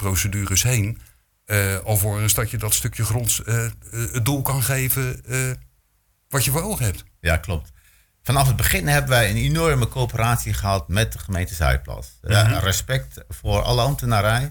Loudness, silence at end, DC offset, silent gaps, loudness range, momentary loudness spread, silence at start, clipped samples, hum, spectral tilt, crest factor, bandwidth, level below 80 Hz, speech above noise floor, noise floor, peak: -21 LUFS; 0 s; under 0.1%; none; 3 LU; 9 LU; 0 s; under 0.1%; none; -4 dB/octave; 16 dB; 19.5 kHz; -34 dBFS; 44 dB; -65 dBFS; -4 dBFS